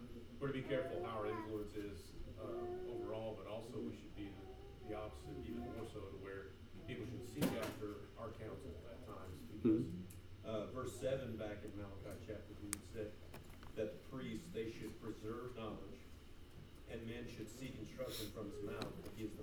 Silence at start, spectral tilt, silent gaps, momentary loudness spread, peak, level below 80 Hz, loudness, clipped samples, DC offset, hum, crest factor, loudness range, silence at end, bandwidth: 0 s; -6 dB/octave; none; 12 LU; -18 dBFS; -60 dBFS; -47 LUFS; under 0.1%; under 0.1%; none; 28 dB; 6 LU; 0 s; over 20 kHz